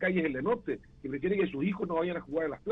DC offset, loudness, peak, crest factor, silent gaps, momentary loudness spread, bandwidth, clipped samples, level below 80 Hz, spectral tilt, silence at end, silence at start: under 0.1%; -32 LUFS; -18 dBFS; 14 dB; none; 8 LU; 4.1 kHz; under 0.1%; -58 dBFS; -9 dB/octave; 0 s; 0 s